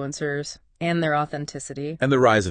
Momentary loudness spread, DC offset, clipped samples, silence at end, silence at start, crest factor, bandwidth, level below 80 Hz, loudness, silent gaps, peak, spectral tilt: 14 LU; under 0.1%; under 0.1%; 0 s; 0 s; 18 dB; 10 kHz; -56 dBFS; -24 LUFS; none; -4 dBFS; -5.5 dB/octave